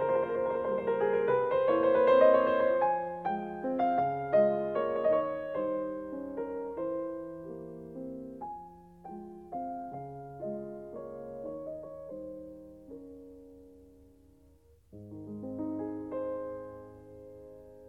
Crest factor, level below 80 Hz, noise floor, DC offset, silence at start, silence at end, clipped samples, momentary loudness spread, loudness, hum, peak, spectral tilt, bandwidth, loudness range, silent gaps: 20 dB; -66 dBFS; -62 dBFS; under 0.1%; 0 s; 0 s; under 0.1%; 22 LU; -31 LUFS; none; -12 dBFS; -8.5 dB/octave; 4.6 kHz; 18 LU; none